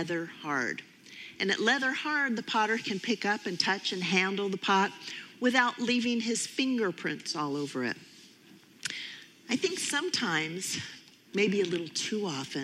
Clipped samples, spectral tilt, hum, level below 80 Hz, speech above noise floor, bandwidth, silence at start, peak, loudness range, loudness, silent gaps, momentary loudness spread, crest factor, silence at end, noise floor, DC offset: under 0.1%; -3 dB/octave; none; -82 dBFS; 26 dB; 15 kHz; 0 s; -10 dBFS; 5 LU; -30 LUFS; none; 12 LU; 22 dB; 0 s; -56 dBFS; under 0.1%